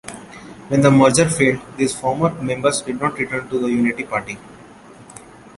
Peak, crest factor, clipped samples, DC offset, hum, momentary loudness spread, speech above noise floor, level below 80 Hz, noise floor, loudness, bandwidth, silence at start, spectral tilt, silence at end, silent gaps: -2 dBFS; 18 dB; under 0.1%; under 0.1%; none; 21 LU; 25 dB; -50 dBFS; -42 dBFS; -18 LUFS; 11.5 kHz; 0.05 s; -5 dB/octave; 0.4 s; none